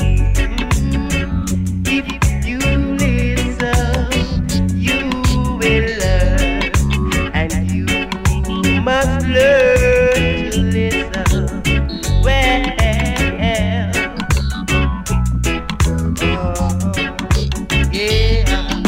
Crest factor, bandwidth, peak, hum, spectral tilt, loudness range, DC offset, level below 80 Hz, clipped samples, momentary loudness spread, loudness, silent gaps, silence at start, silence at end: 12 dB; 16.5 kHz; -2 dBFS; none; -5 dB/octave; 3 LU; under 0.1%; -20 dBFS; under 0.1%; 5 LU; -16 LUFS; none; 0 s; 0 s